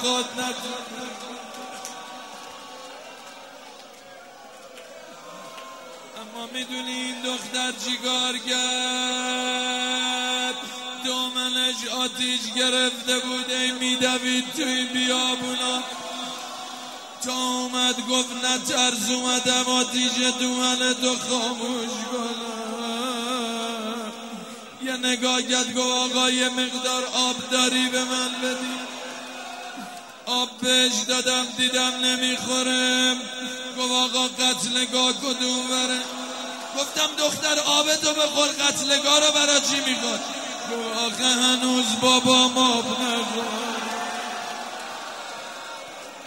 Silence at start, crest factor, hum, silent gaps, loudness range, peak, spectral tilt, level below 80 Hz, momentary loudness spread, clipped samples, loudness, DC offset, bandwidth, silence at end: 0 s; 22 dB; none; none; 12 LU; -4 dBFS; -0.5 dB/octave; -74 dBFS; 17 LU; under 0.1%; -22 LUFS; under 0.1%; 16 kHz; 0 s